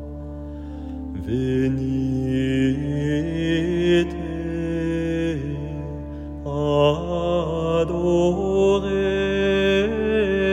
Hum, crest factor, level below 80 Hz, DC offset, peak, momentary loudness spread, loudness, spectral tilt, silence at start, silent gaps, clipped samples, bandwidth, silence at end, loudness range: none; 16 dB; -38 dBFS; under 0.1%; -4 dBFS; 13 LU; -22 LUFS; -7 dB/octave; 0 s; none; under 0.1%; 9.6 kHz; 0 s; 4 LU